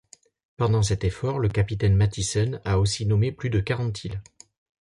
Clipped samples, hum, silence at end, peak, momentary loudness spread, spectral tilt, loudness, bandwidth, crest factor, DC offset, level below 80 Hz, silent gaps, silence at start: under 0.1%; none; 0.6 s; -10 dBFS; 6 LU; -5.5 dB/octave; -24 LUFS; 11.5 kHz; 14 dB; under 0.1%; -40 dBFS; none; 0.6 s